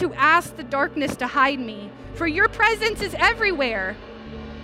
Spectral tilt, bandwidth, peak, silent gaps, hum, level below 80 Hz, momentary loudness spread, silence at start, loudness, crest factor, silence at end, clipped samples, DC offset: -4 dB/octave; 16 kHz; -4 dBFS; none; none; -44 dBFS; 19 LU; 0 s; -21 LUFS; 18 dB; 0 s; under 0.1%; under 0.1%